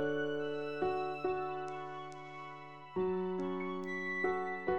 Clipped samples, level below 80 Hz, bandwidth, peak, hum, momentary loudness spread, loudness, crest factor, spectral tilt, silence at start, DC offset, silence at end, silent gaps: under 0.1%; -70 dBFS; 8 kHz; -22 dBFS; none; 12 LU; -38 LUFS; 16 dB; -7 dB/octave; 0 s; 0.2%; 0 s; none